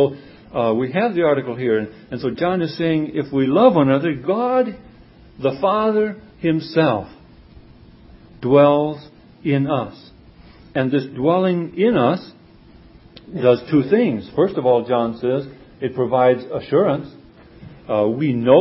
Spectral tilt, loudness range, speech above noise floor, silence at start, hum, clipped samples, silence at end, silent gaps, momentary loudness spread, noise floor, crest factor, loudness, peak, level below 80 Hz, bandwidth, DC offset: -12 dB/octave; 3 LU; 28 dB; 0 s; none; under 0.1%; 0 s; none; 12 LU; -46 dBFS; 18 dB; -19 LUFS; 0 dBFS; -52 dBFS; 5.8 kHz; under 0.1%